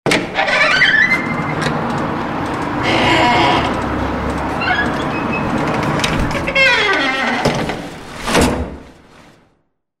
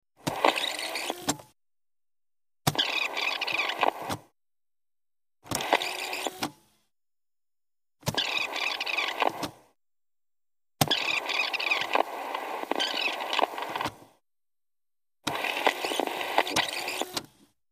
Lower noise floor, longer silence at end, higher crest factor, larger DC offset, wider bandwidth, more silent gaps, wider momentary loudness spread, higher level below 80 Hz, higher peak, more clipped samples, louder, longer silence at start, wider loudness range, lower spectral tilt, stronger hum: second, -63 dBFS vs under -90 dBFS; first, 1.1 s vs 0.45 s; second, 16 dB vs 28 dB; neither; about the same, 16 kHz vs 15.5 kHz; neither; about the same, 10 LU vs 9 LU; first, -32 dBFS vs -66 dBFS; about the same, -2 dBFS vs -4 dBFS; neither; first, -15 LUFS vs -29 LUFS; second, 0.05 s vs 0.25 s; about the same, 3 LU vs 4 LU; first, -4.5 dB/octave vs -2.5 dB/octave; neither